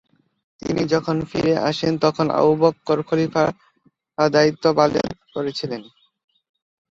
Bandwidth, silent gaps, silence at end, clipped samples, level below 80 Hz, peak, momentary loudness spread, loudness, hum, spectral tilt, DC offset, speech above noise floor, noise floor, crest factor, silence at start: 7.6 kHz; none; 1.1 s; under 0.1%; -54 dBFS; -2 dBFS; 11 LU; -20 LUFS; none; -6 dB/octave; under 0.1%; 43 dB; -62 dBFS; 18 dB; 0.65 s